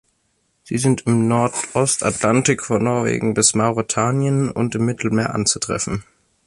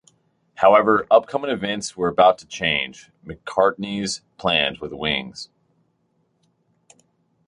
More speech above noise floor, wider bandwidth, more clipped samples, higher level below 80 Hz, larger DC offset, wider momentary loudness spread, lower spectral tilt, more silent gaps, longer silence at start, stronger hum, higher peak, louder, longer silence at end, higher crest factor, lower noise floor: about the same, 48 dB vs 47 dB; about the same, 11.5 kHz vs 11 kHz; neither; about the same, -50 dBFS vs -54 dBFS; neither; second, 6 LU vs 15 LU; about the same, -4.5 dB/octave vs -3.5 dB/octave; neither; about the same, 0.65 s vs 0.6 s; neither; about the same, -2 dBFS vs -2 dBFS; about the same, -18 LUFS vs -20 LUFS; second, 0.45 s vs 2 s; about the same, 18 dB vs 20 dB; about the same, -66 dBFS vs -68 dBFS